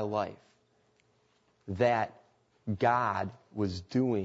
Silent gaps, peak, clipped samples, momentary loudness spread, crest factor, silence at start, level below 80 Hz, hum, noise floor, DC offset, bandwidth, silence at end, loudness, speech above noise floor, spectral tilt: none; -14 dBFS; under 0.1%; 13 LU; 20 dB; 0 s; -66 dBFS; none; -70 dBFS; under 0.1%; 8 kHz; 0 s; -31 LUFS; 40 dB; -7.5 dB/octave